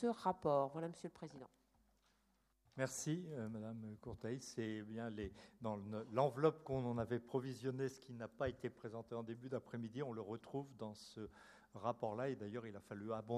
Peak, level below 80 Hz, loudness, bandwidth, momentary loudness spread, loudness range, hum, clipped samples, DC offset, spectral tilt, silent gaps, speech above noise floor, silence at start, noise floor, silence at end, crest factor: -22 dBFS; -72 dBFS; -45 LUFS; 14 kHz; 14 LU; 6 LU; none; under 0.1%; under 0.1%; -6 dB/octave; none; 36 dB; 0 s; -80 dBFS; 0 s; 24 dB